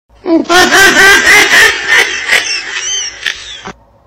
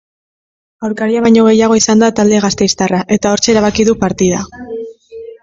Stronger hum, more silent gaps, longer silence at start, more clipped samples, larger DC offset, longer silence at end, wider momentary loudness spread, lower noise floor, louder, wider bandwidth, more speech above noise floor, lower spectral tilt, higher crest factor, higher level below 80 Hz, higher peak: neither; neither; second, 0.25 s vs 0.8 s; first, 0.3% vs under 0.1%; neither; first, 0.35 s vs 0.1 s; about the same, 15 LU vs 16 LU; about the same, -30 dBFS vs -31 dBFS; first, -6 LUFS vs -11 LUFS; first, 17.5 kHz vs 7.8 kHz; about the same, 24 dB vs 21 dB; second, -0.5 dB/octave vs -4.5 dB/octave; about the same, 8 dB vs 12 dB; about the same, -40 dBFS vs -42 dBFS; about the same, 0 dBFS vs 0 dBFS